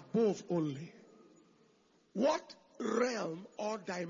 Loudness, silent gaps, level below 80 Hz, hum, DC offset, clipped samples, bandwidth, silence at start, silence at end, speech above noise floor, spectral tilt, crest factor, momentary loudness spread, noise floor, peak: -36 LUFS; none; -82 dBFS; none; under 0.1%; under 0.1%; 7.2 kHz; 0 s; 0 s; 35 dB; -5 dB/octave; 18 dB; 14 LU; -70 dBFS; -18 dBFS